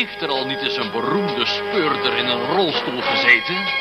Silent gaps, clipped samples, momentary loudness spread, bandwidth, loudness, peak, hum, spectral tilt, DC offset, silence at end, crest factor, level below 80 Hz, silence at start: none; under 0.1%; 8 LU; 13.5 kHz; -18 LUFS; -2 dBFS; none; -4.5 dB/octave; under 0.1%; 0 s; 18 dB; -58 dBFS; 0 s